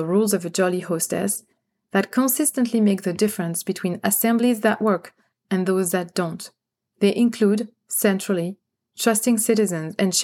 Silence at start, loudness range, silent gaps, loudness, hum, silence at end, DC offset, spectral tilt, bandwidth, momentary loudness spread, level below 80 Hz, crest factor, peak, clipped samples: 0 s; 2 LU; none; -21 LUFS; none; 0 s; under 0.1%; -4.5 dB/octave; 17.5 kHz; 7 LU; -78 dBFS; 16 dB; -4 dBFS; under 0.1%